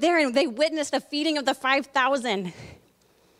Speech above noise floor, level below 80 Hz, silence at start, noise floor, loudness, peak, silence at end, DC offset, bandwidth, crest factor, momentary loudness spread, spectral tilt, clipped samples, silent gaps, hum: 37 dB; -66 dBFS; 0 s; -61 dBFS; -24 LUFS; -8 dBFS; 0.65 s; under 0.1%; 15.5 kHz; 18 dB; 7 LU; -3.5 dB/octave; under 0.1%; none; none